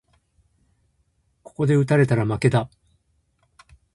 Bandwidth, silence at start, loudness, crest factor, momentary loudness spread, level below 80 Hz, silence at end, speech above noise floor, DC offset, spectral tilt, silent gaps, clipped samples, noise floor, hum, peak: 11.5 kHz; 1.6 s; -20 LUFS; 20 dB; 14 LU; -54 dBFS; 1.25 s; 48 dB; under 0.1%; -7.5 dB/octave; none; under 0.1%; -67 dBFS; none; -4 dBFS